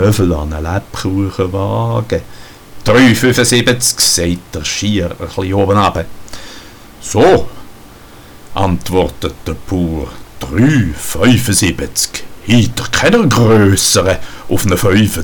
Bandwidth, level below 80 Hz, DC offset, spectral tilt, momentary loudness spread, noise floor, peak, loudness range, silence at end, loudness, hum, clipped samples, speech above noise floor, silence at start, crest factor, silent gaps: 19.5 kHz; -32 dBFS; under 0.1%; -4.5 dB/octave; 14 LU; -36 dBFS; 0 dBFS; 5 LU; 0 s; -12 LUFS; none; under 0.1%; 24 dB; 0 s; 12 dB; none